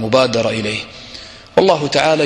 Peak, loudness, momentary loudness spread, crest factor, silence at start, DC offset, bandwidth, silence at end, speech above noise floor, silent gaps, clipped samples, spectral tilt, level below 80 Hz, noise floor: 0 dBFS; -16 LUFS; 18 LU; 16 dB; 0 s; under 0.1%; 11 kHz; 0 s; 21 dB; none; under 0.1%; -4.5 dB/octave; -48 dBFS; -36 dBFS